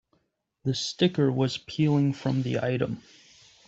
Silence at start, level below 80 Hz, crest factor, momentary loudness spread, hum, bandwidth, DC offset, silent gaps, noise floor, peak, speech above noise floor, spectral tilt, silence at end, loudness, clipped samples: 0.65 s; -62 dBFS; 18 dB; 8 LU; none; 8 kHz; under 0.1%; none; -74 dBFS; -8 dBFS; 48 dB; -6.5 dB/octave; 0.7 s; -27 LUFS; under 0.1%